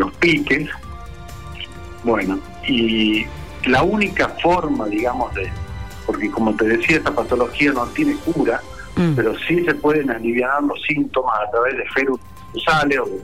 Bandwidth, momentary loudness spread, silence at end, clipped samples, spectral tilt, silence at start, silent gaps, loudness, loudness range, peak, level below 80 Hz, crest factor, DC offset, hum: 15.5 kHz; 13 LU; 0 s; under 0.1%; -6 dB/octave; 0 s; none; -19 LUFS; 2 LU; -6 dBFS; -40 dBFS; 14 dB; 1%; none